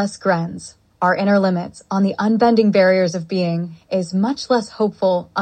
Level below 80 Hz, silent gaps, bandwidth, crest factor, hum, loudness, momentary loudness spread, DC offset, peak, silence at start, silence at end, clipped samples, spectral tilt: -60 dBFS; none; 8.8 kHz; 16 dB; none; -18 LUFS; 10 LU; under 0.1%; -2 dBFS; 0 s; 0 s; under 0.1%; -6.5 dB/octave